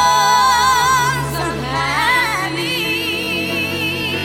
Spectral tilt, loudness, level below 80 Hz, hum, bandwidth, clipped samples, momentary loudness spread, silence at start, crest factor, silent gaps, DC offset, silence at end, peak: -2.5 dB/octave; -16 LUFS; -40 dBFS; none; 17.5 kHz; under 0.1%; 7 LU; 0 s; 14 dB; none; under 0.1%; 0 s; -2 dBFS